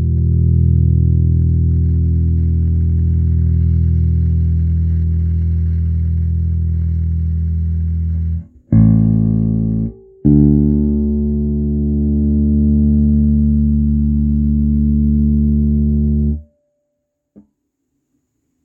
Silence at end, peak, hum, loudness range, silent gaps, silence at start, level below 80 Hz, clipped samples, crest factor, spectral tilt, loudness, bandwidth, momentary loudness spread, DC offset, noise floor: 2.25 s; 0 dBFS; none; 3 LU; none; 0 s; -20 dBFS; under 0.1%; 14 dB; -14.5 dB/octave; -15 LUFS; 1.2 kHz; 6 LU; under 0.1%; -72 dBFS